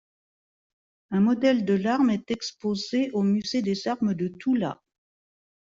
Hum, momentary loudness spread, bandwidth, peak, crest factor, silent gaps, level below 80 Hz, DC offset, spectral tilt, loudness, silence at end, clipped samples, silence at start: none; 8 LU; 7.6 kHz; -10 dBFS; 16 dB; none; -66 dBFS; under 0.1%; -6 dB/octave; -25 LUFS; 1 s; under 0.1%; 1.1 s